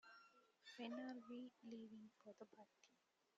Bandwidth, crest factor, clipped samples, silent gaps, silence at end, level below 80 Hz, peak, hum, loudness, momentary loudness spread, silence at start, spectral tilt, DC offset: 7.4 kHz; 20 dB; under 0.1%; none; 0.45 s; under -90 dBFS; -38 dBFS; none; -58 LUFS; 14 LU; 0.05 s; -3 dB/octave; under 0.1%